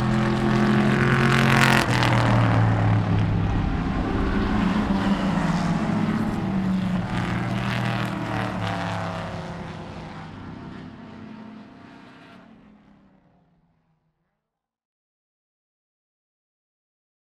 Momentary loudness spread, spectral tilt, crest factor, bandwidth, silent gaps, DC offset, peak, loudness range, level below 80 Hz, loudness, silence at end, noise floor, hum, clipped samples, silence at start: 19 LU; -6.5 dB/octave; 24 dB; 14 kHz; none; under 0.1%; 0 dBFS; 20 LU; -38 dBFS; -22 LUFS; 4.85 s; -83 dBFS; none; under 0.1%; 0 s